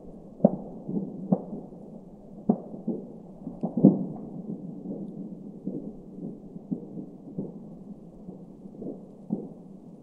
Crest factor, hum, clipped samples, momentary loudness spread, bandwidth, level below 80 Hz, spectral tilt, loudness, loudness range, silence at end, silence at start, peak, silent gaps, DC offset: 28 dB; none; under 0.1%; 19 LU; 1.6 kHz; -60 dBFS; -13 dB/octave; -31 LUFS; 11 LU; 0 s; 0 s; -2 dBFS; none; under 0.1%